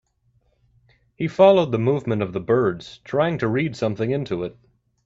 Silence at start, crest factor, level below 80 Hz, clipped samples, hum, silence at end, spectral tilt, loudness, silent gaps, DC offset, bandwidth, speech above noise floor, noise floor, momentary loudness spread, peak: 1.2 s; 20 dB; -56 dBFS; under 0.1%; none; 0.55 s; -7.5 dB/octave; -21 LUFS; none; under 0.1%; 7.8 kHz; 44 dB; -64 dBFS; 13 LU; -2 dBFS